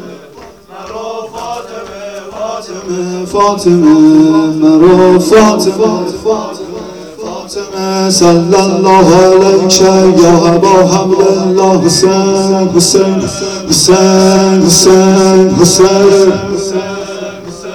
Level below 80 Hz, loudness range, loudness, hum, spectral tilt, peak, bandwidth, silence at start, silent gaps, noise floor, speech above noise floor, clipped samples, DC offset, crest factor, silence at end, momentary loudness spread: -38 dBFS; 6 LU; -7 LUFS; none; -4.5 dB/octave; 0 dBFS; 19.5 kHz; 0 s; none; -33 dBFS; 27 dB; 3%; 0.3%; 8 dB; 0 s; 17 LU